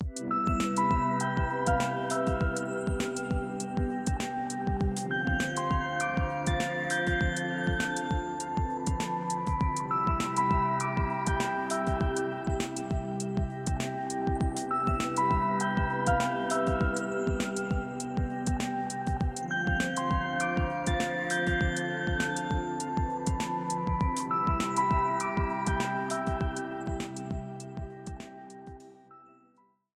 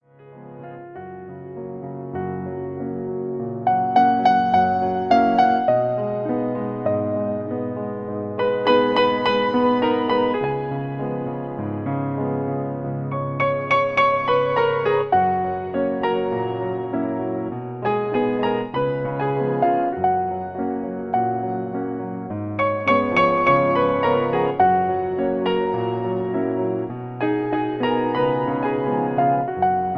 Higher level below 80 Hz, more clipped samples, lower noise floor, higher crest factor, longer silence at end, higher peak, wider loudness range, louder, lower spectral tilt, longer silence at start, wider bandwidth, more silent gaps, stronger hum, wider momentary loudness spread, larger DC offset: first, -40 dBFS vs -56 dBFS; neither; first, -66 dBFS vs -43 dBFS; about the same, 16 dB vs 16 dB; first, 0.75 s vs 0 s; second, -14 dBFS vs -4 dBFS; second, 2 LU vs 5 LU; second, -30 LUFS vs -21 LUFS; second, -5.5 dB/octave vs -8 dB/octave; second, 0 s vs 0.2 s; first, 14 kHz vs 6.6 kHz; neither; neither; second, 6 LU vs 11 LU; neither